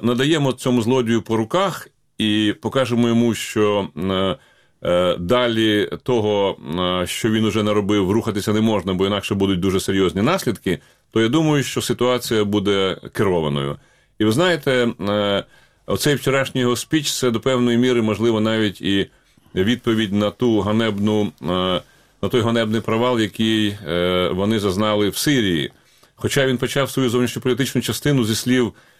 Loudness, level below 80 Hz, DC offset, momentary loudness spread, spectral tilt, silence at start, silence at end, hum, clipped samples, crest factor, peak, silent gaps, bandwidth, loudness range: -19 LUFS; -50 dBFS; 0.2%; 5 LU; -5 dB/octave; 0 s; 0.3 s; none; under 0.1%; 16 dB; -4 dBFS; none; 16 kHz; 1 LU